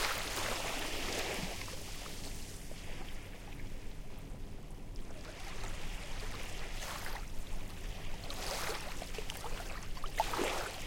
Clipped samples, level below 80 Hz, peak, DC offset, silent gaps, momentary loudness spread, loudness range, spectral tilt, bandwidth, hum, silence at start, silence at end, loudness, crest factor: under 0.1%; -44 dBFS; -16 dBFS; under 0.1%; none; 13 LU; 8 LU; -3 dB/octave; 17 kHz; none; 0 s; 0 s; -42 LUFS; 22 dB